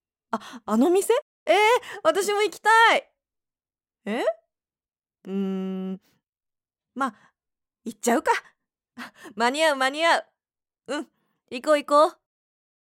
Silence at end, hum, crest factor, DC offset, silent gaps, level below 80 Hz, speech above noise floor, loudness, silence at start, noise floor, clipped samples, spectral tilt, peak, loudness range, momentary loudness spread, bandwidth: 0.8 s; none; 18 dB; under 0.1%; 1.22-1.46 s, 6.29-6.33 s; -76 dBFS; over 67 dB; -23 LUFS; 0.35 s; under -90 dBFS; under 0.1%; -3.5 dB/octave; -6 dBFS; 11 LU; 21 LU; 16.5 kHz